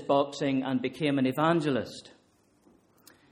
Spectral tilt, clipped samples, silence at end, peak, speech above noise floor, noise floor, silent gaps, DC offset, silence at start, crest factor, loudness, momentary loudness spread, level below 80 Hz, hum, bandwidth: -6.5 dB/octave; under 0.1%; 1.25 s; -12 dBFS; 38 dB; -65 dBFS; none; under 0.1%; 0 s; 18 dB; -28 LUFS; 8 LU; -70 dBFS; none; 16 kHz